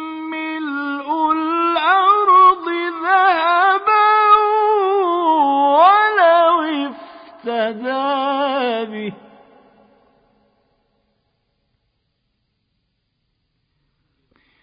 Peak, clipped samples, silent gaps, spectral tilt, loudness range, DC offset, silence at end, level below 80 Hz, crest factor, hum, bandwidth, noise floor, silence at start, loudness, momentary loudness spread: -2 dBFS; under 0.1%; none; -8.5 dB/octave; 11 LU; under 0.1%; 5.5 s; -66 dBFS; 16 dB; none; 5.2 kHz; -70 dBFS; 0 s; -15 LUFS; 13 LU